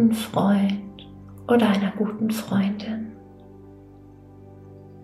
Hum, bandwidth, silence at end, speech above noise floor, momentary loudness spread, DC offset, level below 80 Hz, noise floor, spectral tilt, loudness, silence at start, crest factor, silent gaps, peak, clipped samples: 50 Hz at -45 dBFS; 14 kHz; 0 s; 24 dB; 24 LU; under 0.1%; -58 dBFS; -46 dBFS; -6.5 dB/octave; -23 LUFS; 0 s; 16 dB; none; -8 dBFS; under 0.1%